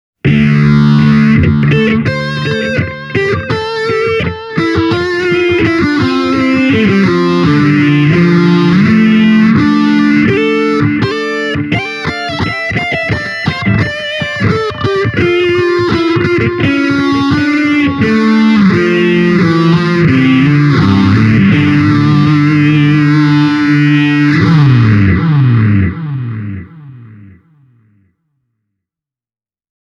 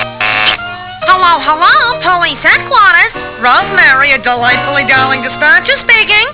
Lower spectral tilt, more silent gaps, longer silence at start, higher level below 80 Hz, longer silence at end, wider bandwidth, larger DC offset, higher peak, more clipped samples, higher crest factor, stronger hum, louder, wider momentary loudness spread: first, -7.5 dB/octave vs -6 dB/octave; neither; first, 0.25 s vs 0 s; about the same, -36 dBFS vs -40 dBFS; first, 2.65 s vs 0 s; first, 10 kHz vs 4 kHz; second, under 0.1% vs 0.3%; about the same, 0 dBFS vs 0 dBFS; second, under 0.1% vs 0.5%; about the same, 10 dB vs 10 dB; neither; second, -10 LUFS vs -7 LUFS; about the same, 7 LU vs 6 LU